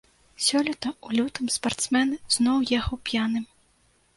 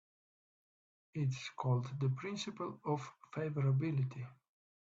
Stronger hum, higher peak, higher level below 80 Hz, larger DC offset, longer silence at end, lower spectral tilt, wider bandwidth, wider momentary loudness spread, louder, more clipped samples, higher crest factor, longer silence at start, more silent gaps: neither; first, -10 dBFS vs -22 dBFS; first, -46 dBFS vs -76 dBFS; neither; about the same, 0.7 s vs 0.6 s; second, -2.5 dB/octave vs -7 dB/octave; first, 11.5 kHz vs 7.8 kHz; second, 6 LU vs 11 LU; first, -25 LUFS vs -39 LUFS; neither; about the same, 18 dB vs 18 dB; second, 0.4 s vs 1.15 s; neither